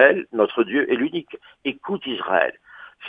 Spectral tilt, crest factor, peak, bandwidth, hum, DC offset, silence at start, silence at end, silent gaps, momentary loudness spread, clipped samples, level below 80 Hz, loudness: -7.5 dB/octave; 20 dB; -2 dBFS; 3.9 kHz; none; under 0.1%; 0 s; 0 s; none; 10 LU; under 0.1%; -68 dBFS; -22 LUFS